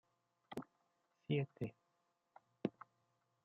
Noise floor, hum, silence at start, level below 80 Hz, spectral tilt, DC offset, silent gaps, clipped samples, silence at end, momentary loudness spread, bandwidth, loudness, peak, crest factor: -84 dBFS; none; 0.5 s; -84 dBFS; -7 dB/octave; under 0.1%; none; under 0.1%; 0.75 s; 22 LU; 7.4 kHz; -46 LUFS; -22 dBFS; 26 dB